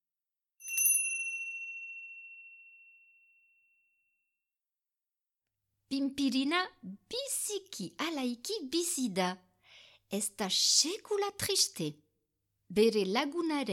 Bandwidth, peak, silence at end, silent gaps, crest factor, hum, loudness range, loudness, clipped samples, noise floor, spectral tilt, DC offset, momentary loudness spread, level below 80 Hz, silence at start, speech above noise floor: 19 kHz; -12 dBFS; 0 s; none; 22 dB; none; 14 LU; -31 LUFS; under 0.1%; under -90 dBFS; -2 dB/octave; under 0.1%; 17 LU; -74 dBFS; 0.6 s; over 57 dB